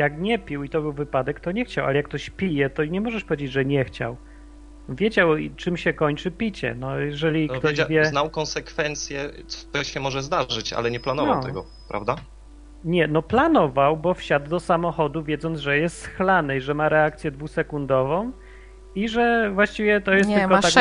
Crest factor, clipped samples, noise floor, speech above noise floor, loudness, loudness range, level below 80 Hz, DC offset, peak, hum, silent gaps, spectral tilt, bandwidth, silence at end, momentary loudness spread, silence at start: 22 dB; under 0.1%; -44 dBFS; 21 dB; -23 LUFS; 4 LU; -44 dBFS; under 0.1%; 0 dBFS; none; none; -5 dB/octave; 10.5 kHz; 0 s; 10 LU; 0 s